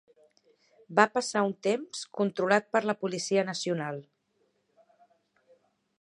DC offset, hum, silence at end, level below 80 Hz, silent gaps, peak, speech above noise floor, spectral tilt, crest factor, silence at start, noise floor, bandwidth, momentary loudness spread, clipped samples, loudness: under 0.1%; none; 2 s; -82 dBFS; none; -4 dBFS; 45 dB; -4 dB/octave; 26 dB; 0.9 s; -73 dBFS; 11.5 kHz; 8 LU; under 0.1%; -29 LUFS